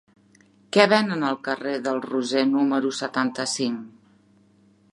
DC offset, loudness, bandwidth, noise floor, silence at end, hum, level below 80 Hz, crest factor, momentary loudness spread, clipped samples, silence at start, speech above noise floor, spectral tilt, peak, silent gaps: under 0.1%; -23 LUFS; 11.5 kHz; -58 dBFS; 1.05 s; none; -76 dBFS; 22 dB; 9 LU; under 0.1%; 0.75 s; 36 dB; -4 dB/octave; -2 dBFS; none